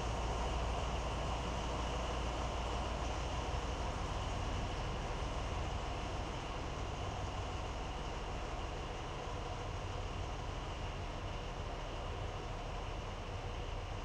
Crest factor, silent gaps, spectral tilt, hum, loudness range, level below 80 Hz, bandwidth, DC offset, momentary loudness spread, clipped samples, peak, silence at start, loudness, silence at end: 14 dB; none; -5 dB/octave; none; 4 LU; -44 dBFS; 10.5 kHz; under 0.1%; 5 LU; under 0.1%; -26 dBFS; 0 s; -42 LUFS; 0 s